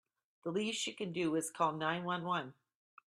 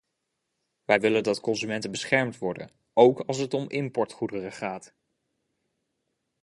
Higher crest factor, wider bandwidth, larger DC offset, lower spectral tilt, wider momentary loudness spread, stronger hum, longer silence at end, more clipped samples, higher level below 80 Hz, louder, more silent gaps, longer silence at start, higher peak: about the same, 20 dB vs 24 dB; first, 14.5 kHz vs 11.5 kHz; neither; about the same, -4 dB/octave vs -5 dB/octave; second, 6 LU vs 14 LU; neither; second, 0.55 s vs 1.6 s; neither; second, -82 dBFS vs -68 dBFS; second, -37 LUFS vs -26 LUFS; neither; second, 0.45 s vs 0.9 s; second, -18 dBFS vs -4 dBFS